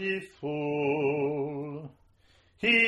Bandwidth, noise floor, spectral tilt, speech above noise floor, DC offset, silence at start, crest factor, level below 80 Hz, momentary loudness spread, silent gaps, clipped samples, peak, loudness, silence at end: 10.5 kHz; -63 dBFS; -6 dB/octave; 33 dB; under 0.1%; 0 s; 18 dB; -66 dBFS; 12 LU; none; under 0.1%; -12 dBFS; -30 LUFS; 0 s